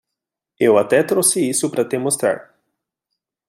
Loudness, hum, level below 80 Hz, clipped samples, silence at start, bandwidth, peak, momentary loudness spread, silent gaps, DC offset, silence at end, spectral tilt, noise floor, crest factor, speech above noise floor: -17 LUFS; none; -68 dBFS; under 0.1%; 0.6 s; 16 kHz; -2 dBFS; 6 LU; none; under 0.1%; 1.05 s; -3.5 dB/octave; -83 dBFS; 18 dB; 66 dB